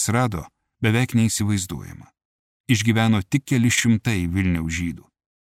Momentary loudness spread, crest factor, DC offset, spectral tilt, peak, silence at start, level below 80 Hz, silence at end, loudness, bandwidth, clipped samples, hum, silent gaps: 12 LU; 18 dB; under 0.1%; -5 dB/octave; -4 dBFS; 0 s; -44 dBFS; 0.45 s; -21 LUFS; 16 kHz; under 0.1%; none; 2.25-2.64 s